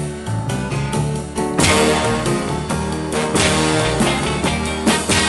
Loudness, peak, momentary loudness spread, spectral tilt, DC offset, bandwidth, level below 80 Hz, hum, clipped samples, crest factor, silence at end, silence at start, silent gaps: -18 LUFS; -2 dBFS; 8 LU; -4 dB/octave; under 0.1%; 12.5 kHz; -34 dBFS; none; under 0.1%; 16 dB; 0 s; 0 s; none